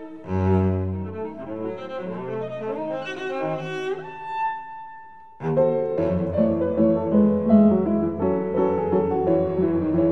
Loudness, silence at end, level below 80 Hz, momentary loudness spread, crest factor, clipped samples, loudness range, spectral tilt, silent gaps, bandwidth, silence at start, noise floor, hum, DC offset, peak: -23 LUFS; 0 s; -52 dBFS; 13 LU; 18 dB; under 0.1%; 9 LU; -9.5 dB/octave; none; 6.4 kHz; 0 s; -44 dBFS; none; 0.4%; -4 dBFS